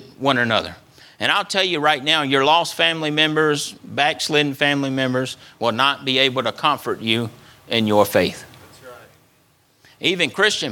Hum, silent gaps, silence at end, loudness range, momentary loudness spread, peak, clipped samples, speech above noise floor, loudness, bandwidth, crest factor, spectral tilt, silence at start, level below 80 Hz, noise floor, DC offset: none; none; 0 s; 4 LU; 7 LU; 0 dBFS; under 0.1%; 39 dB; -19 LUFS; 19 kHz; 20 dB; -3.5 dB/octave; 0 s; -62 dBFS; -58 dBFS; under 0.1%